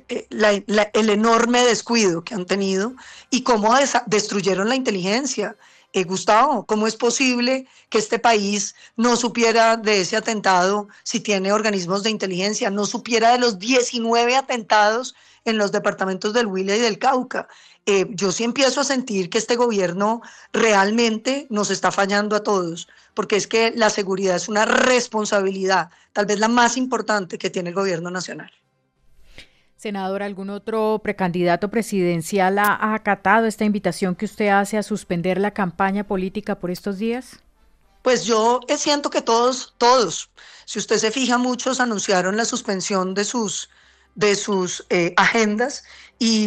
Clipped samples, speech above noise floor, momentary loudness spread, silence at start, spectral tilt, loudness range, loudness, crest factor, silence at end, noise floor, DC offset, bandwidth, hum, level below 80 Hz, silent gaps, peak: under 0.1%; 40 dB; 10 LU; 0.1 s; -3.5 dB/octave; 4 LU; -20 LUFS; 18 dB; 0 s; -60 dBFS; under 0.1%; 14 kHz; none; -58 dBFS; none; -2 dBFS